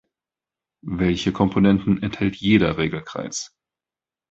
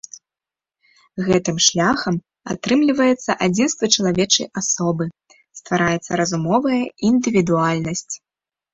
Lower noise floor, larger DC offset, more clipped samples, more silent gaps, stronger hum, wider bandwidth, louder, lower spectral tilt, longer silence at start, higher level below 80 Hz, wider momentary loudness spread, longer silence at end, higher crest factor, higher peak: about the same, under -90 dBFS vs -89 dBFS; neither; neither; neither; neither; about the same, 8 kHz vs 8 kHz; second, -21 LUFS vs -18 LUFS; first, -6 dB/octave vs -4 dB/octave; first, 0.85 s vs 0.15 s; first, -44 dBFS vs -54 dBFS; about the same, 13 LU vs 11 LU; first, 0.85 s vs 0.55 s; about the same, 20 dB vs 20 dB; about the same, -2 dBFS vs 0 dBFS